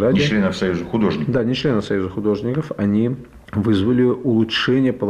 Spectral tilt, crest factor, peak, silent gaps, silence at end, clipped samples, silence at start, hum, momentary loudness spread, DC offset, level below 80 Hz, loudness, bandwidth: -7 dB/octave; 10 dB; -8 dBFS; none; 0 s; under 0.1%; 0 s; none; 6 LU; under 0.1%; -46 dBFS; -19 LUFS; 10 kHz